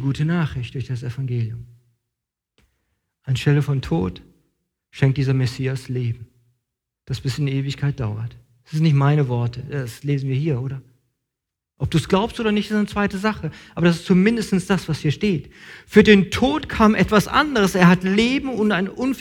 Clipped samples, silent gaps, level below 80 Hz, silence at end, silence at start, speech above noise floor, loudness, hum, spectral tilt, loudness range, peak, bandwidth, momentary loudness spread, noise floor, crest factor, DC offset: under 0.1%; none; -44 dBFS; 0 s; 0 s; 64 dB; -20 LUFS; none; -6.5 dB/octave; 9 LU; 0 dBFS; 16 kHz; 14 LU; -83 dBFS; 20 dB; under 0.1%